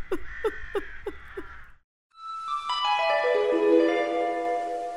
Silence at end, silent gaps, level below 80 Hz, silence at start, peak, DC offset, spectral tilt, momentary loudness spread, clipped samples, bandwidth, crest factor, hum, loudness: 0 s; 1.84-2.10 s; -50 dBFS; 0 s; -10 dBFS; under 0.1%; -4 dB/octave; 20 LU; under 0.1%; 13 kHz; 18 dB; none; -26 LUFS